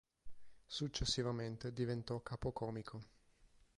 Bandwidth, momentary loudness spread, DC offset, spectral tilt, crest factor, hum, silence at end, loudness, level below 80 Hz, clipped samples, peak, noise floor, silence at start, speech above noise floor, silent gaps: 11.5 kHz; 10 LU; under 0.1%; -5 dB/octave; 20 dB; none; 0.2 s; -42 LUFS; -58 dBFS; under 0.1%; -24 dBFS; -69 dBFS; 0.25 s; 27 dB; none